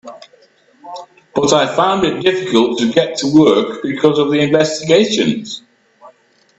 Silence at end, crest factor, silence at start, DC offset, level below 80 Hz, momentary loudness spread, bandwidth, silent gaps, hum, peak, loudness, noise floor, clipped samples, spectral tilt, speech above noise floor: 0.5 s; 14 dB; 0.05 s; under 0.1%; -54 dBFS; 17 LU; 8.4 kHz; none; none; 0 dBFS; -14 LUFS; -50 dBFS; under 0.1%; -4.5 dB/octave; 37 dB